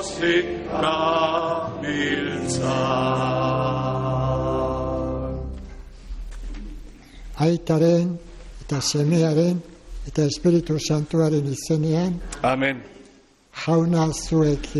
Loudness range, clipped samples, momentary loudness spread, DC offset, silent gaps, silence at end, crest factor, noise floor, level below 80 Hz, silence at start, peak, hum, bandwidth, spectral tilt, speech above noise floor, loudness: 5 LU; under 0.1%; 18 LU; under 0.1%; none; 0 s; 14 dB; -53 dBFS; -38 dBFS; 0 s; -8 dBFS; none; 12 kHz; -6 dB/octave; 31 dB; -22 LUFS